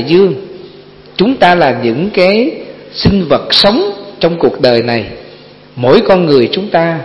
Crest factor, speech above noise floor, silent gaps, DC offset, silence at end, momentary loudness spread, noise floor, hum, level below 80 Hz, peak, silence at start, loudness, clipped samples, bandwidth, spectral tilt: 10 dB; 26 dB; none; under 0.1%; 0 s; 16 LU; -36 dBFS; 50 Hz at -45 dBFS; -38 dBFS; 0 dBFS; 0 s; -10 LUFS; 0.4%; 11 kHz; -7 dB/octave